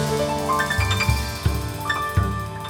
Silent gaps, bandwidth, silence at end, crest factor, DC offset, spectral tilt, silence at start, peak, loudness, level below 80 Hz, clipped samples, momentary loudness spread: none; 18 kHz; 0 s; 16 dB; under 0.1%; -4.5 dB/octave; 0 s; -6 dBFS; -23 LUFS; -30 dBFS; under 0.1%; 5 LU